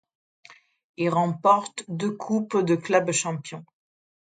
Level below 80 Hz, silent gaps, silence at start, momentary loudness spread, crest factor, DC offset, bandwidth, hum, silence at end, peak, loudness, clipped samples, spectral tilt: -72 dBFS; 0.84-0.94 s; 0.5 s; 13 LU; 20 dB; under 0.1%; 9.4 kHz; none; 0.65 s; -6 dBFS; -24 LUFS; under 0.1%; -5 dB/octave